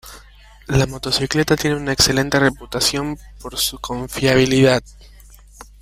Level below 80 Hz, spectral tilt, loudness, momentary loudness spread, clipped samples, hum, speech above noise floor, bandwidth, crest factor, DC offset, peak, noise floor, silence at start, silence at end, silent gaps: -38 dBFS; -4 dB/octave; -18 LUFS; 11 LU; under 0.1%; 50 Hz at -40 dBFS; 26 dB; 16 kHz; 18 dB; under 0.1%; 0 dBFS; -44 dBFS; 0.05 s; 0.2 s; none